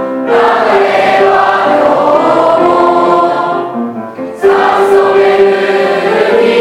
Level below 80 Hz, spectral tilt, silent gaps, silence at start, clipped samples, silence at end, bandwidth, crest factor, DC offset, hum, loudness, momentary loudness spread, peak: -50 dBFS; -5.5 dB/octave; none; 0 s; 0.5%; 0 s; 12.5 kHz; 8 dB; under 0.1%; none; -8 LUFS; 7 LU; 0 dBFS